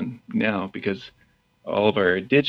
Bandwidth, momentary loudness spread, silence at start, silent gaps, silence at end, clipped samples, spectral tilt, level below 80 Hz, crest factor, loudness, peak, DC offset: 6.2 kHz; 11 LU; 0 s; none; 0 s; under 0.1%; -7.5 dB/octave; -62 dBFS; 20 dB; -24 LUFS; -4 dBFS; under 0.1%